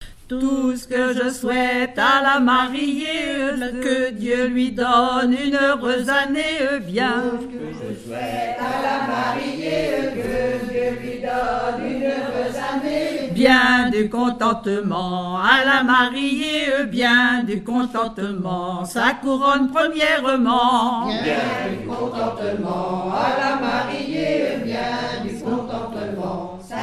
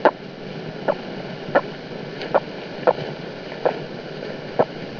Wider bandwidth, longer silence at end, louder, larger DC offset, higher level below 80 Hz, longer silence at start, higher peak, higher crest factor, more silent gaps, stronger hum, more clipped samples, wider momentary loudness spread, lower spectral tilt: first, 13.5 kHz vs 5.4 kHz; about the same, 0 s vs 0 s; first, -20 LUFS vs -26 LUFS; neither; first, -46 dBFS vs -58 dBFS; about the same, 0 s vs 0 s; about the same, 0 dBFS vs 0 dBFS; about the same, 20 dB vs 24 dB; neither; neither; neither; about the same, 10 LU vs 11 LU; second, -4.5 dB/octave vs -6.5 dB/octave